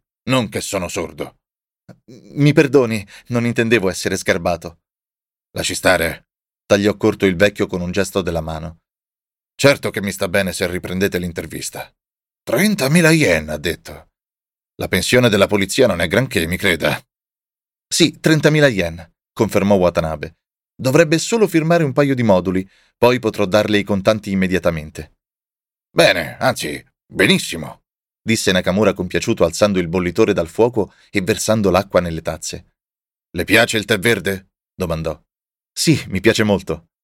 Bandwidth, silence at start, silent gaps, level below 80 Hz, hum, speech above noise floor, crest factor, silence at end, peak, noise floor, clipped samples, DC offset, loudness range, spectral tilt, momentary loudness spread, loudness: 17 kHz; 0.25 s; none; -44 dBFS; none; over 73 dB; 16 dB; 0.25 s; 0 dBFS; under -90 dBFS; under 0.1%; under 0.1%; 3 LU; -5 dB/octave; 15 LU; -17 LUFS